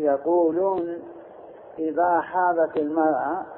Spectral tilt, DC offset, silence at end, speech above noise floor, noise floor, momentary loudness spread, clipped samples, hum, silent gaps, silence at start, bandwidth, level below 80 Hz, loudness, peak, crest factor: -11 dB/octave; under 0.1%; 0 s; 21 dB; -44 dBFS; 16 LU; under 0.1%; none; none; 0 s; 4.1 kHz; -68 dBFS; -23 LUFS; -10 dBFS; 14 dB